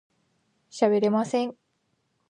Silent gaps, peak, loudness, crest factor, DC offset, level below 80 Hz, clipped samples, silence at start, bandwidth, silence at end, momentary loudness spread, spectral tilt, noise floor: none; -8 dBFS; -25 LUFS; 18 dB; under 0.1%; -80 dBFS; under 0.1%; 0.75 s; 10 kHz; 0.8 s; 12 LU; -6 dB/octave; -73 dBFS